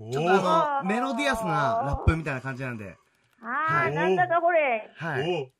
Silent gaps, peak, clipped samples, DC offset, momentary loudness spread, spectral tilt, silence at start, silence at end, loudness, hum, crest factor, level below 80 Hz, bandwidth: none; -8 dBFS; under 0.1%; under 0.1%; 11 LU; -6 dB/octave; 0 s; 0.15 s; -25 LUFS; none; 18 dB; -42 dBFS; 14 kHz